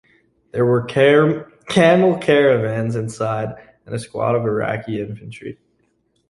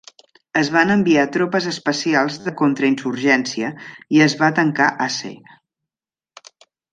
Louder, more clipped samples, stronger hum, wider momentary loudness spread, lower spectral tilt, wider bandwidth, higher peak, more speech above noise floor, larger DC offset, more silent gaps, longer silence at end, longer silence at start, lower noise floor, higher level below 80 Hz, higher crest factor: about the same, -17 LUFS vs -18 LUFS; neither; neither; first, 17 LU vs 9 LU; first, -6.5 dB/octave vs -5 dB/octave; first, 11.5 kHz vs 9.2 kHz; about the same, -2 dBFS vs -2 dBFS; second, 47 dB vs over 72 dB; neither; neither; second, 0.75 s vs 1.6 s; about the same, 0.55 s vs 0.55 s; second, -64 dBFS vs under -90 dBFS; first, -56 dBFS vs -62 dBFS; about the same, 16 dB vs 18 dB